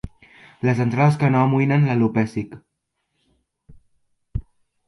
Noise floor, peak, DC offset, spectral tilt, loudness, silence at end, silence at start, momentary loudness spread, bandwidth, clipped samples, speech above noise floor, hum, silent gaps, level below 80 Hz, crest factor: -75 dBFS; -4 dBFS; under 0.1%; -8.5 dB/octave; -19 LUFS; 0.5 s; 0.05 s; 16 LU; 11.5 kHz; under 0.1%; 57 dB; none; none; -44 dBFS; 18 dB